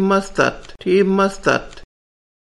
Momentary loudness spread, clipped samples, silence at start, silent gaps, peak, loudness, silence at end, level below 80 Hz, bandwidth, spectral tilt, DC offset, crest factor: 6 LU; under 0.1%; 0 s; none; -2 dBFS; -18 LUFS; 0.7 s; -42 dBFS; 11.5 kHz; -5.5 dB/octave; under 0.1%; 18 dB